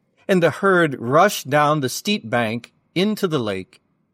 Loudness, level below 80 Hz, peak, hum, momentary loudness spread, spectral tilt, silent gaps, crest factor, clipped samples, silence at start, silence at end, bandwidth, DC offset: -19 LUFS; -66 dBFS; -4 dBFS; none; 10 LU; -5 dB/octave; none; 16 dB; under 0.1%; 0.3 s; 0.5 s; 16 kHz; under 0.1%